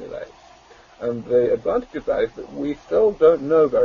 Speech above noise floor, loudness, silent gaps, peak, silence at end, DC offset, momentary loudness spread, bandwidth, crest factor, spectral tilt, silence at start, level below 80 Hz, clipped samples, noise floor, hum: 29 dB; -20 LUFS; none; -4 dBFS; 0 s; under 0.1%; 14 LU; 7 kHz; 16 dB; -7.5 dB/octave; 0 s; -50 dBFS; under 0.1%; -48 dBFS; none